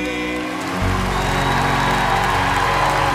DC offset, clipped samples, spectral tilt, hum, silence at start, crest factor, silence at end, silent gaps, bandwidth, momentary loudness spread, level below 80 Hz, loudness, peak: under 0.1%; under 0.1%; -4.5 dB/octave; none; 0 s; 12 dB; 0 s; none; 16 kHz; 6 LU; -30 dBFS; -18 LUFS; -6 dBFS